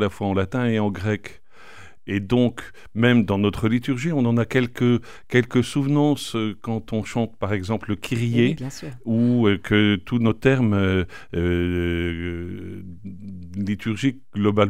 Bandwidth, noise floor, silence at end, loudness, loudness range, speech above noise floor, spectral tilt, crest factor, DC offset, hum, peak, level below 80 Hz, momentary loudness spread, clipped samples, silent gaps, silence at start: 15 kHz; -47 dBFS; 0 s; -22 LUFS; 4 LU; 25 dB; -7 dB/octave; 20 dB; 0.9%; none; -2 dBFS; -46 dBFS; 14 LU; under 0.1%; none; 0 s